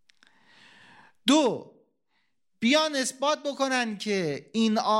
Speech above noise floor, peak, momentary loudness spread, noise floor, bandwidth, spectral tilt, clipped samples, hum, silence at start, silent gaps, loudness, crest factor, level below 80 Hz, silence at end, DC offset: 50 dB; -8 dBFS; 7 LU; -76 dBFS; 16 kHz; -3.5 dB/octave; under 0.1%; none; 1.25 s; none; -26 LUFS; 20 dB; -80 dBFS; 0 s; under 0.1%